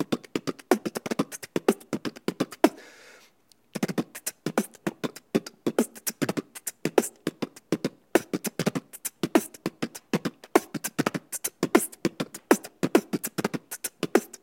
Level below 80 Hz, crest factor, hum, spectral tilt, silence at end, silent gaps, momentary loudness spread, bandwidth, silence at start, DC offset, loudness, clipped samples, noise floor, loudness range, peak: -70 dBFS; 28 dB; none; -4.5 dB/octave; 0.15 s; none; 9 LU; 17 kHz; 0 s; under 0.1%; -29 LUFS; under 0.1%; -62 dBFS; 4 LU; -2 dBFS